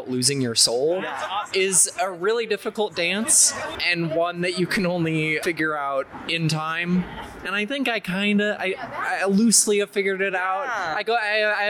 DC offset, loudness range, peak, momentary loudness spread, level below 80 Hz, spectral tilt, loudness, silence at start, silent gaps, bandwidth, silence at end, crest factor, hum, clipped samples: under 0.1%; 4 LU; -6 dBFS; 10 LU; -58 dBFS; -2.5 dB/octave; -21 LUFS; 0 s; none; over 20 kHz; 0 s; 18 dB; none; under 0.1%